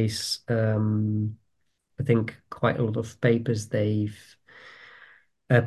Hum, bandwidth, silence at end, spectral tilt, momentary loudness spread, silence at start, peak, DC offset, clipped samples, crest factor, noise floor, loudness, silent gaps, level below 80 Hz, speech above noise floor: none; 12.5 kHz; 0 s; -6.5 dB/octave; 9 LU; 0 s; -6 dBFS; under 0.1%; under 0.1%; 20 dB; -75 dBFS; -26 LUFS; none; -56 dBFS; 50 dB